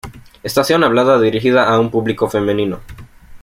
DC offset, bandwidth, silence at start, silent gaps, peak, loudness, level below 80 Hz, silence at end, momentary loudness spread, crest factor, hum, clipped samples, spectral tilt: under 0.1%; 16.5 kHz; 0.05 s; none; -2 dBFS; -14 LUFS; -44 dBFS; 0.05 s; 9 LU; 14 dB; none; under 0.1%; -5.5 dB/octave